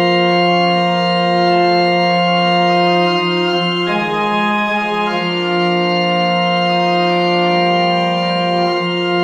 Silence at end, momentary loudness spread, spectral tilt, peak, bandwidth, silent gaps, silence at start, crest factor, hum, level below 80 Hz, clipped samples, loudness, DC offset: 0 s; 4 LU; -6 dB/octave; -2 dBFS; 8.8 kHz; none; 0 s; 12 dB; none; -60 dBFS; under 0.1%; -14 LUFS; under 0.1%